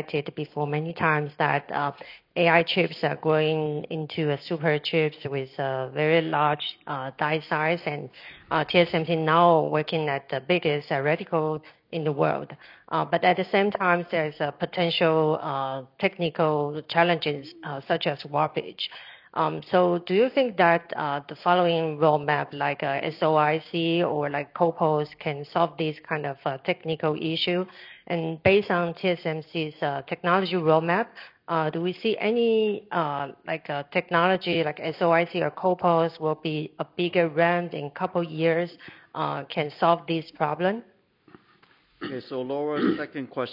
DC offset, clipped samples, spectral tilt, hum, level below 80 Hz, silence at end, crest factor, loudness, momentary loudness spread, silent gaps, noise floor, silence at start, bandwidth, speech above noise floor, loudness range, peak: under 0.1%; under 0.1%; -8.5 dB/octave; none; -70 dBFS; 0 s; 22 dB; -25 LUFS; 10 LU; none; -60 dBFS; 0 s; 5.6 kHz; 35 dB; 3 LU; -4 dBFS